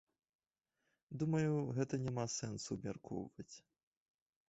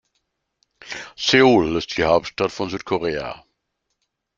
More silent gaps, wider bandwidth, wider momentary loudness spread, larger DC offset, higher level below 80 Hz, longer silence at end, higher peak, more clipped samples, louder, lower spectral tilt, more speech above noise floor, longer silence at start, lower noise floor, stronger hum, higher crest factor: neither; about the same, 8 kHz vs 7.6 kHz; about the same, 17 LU vs 19 LU; neither; second, -72 dBFS vs -50 dBFS; about the same, 0.9 s vs 1 s; second, -24 dBFS vs -2 dBFS; neither; second, -41 LUFS vs -19 LUFS; first, -7 dB/octave vs -4.5 dB/octave; second, 48 dB vs 57 dB; first, 1.1 s vs 0.85 s; first, -89 dBFS vs -76 dBFS; neither; about the same, 18 dB vs 20 dB